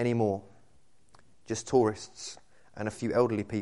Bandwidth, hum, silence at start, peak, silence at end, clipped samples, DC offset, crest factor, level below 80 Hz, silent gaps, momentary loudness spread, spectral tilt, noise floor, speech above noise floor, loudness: 11.5 kHz; none; 0 s; -10 dBFS; 0 s; under 0.1%; 0.2%; 20 dB; -64 dBFS; none; 16 LU; -6 dB/octave; -66 dBFS; 37 dB; -30 LUFS